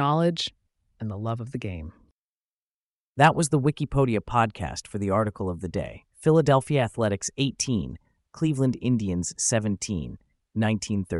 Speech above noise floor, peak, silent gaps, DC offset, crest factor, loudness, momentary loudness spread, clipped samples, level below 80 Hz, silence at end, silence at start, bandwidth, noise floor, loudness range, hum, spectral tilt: over 65 dB; -6 dBFS; 2.12-3.15 s; under 0.1%; 20 dB; -25 LUFS; 14 LU; under 0.1%; -48 dBFS; 0 s; 0 s; 11.5 kHz; under -90 dBFS; 2 LU; none; -5 dB/octave